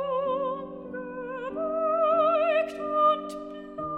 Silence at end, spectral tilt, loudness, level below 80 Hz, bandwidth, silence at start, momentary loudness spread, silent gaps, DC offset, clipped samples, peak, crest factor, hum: 0 s; -6 dB/octave; -26 LUFS; -62 dBFS; 10.5 kHz; 0 s; 15 LU; none; under 0.1%; under 0.1%; -12 dBFS; 14 dB; none